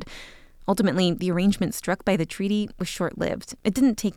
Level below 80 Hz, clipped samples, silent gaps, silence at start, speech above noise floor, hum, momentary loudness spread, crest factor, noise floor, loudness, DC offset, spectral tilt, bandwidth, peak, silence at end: -48 dBFS; under 0.1%; none; 0 s; 21 dB; none; 8 LU; 16 dB; -45 dBFS; -25 LUFS; under 0.1%; -5.5 dB/octave; 16.5 kHz; -8 dBFS; 0.05 s